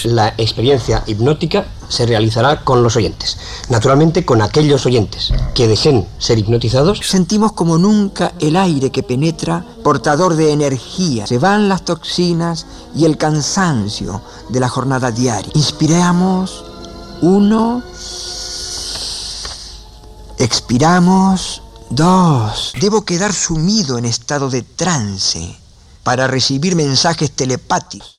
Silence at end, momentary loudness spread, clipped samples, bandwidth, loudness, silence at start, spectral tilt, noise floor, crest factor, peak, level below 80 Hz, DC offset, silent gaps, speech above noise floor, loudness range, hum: 0.1 s; 11 LU; under 0.1%; 13 kHz; -14 LUFS; 0 s; -5 dB/octave; -35 dBFS; 12 dB; -2 dBFS; -32 dBFS; under 0.1%; none; 22 dB; 3 LU; none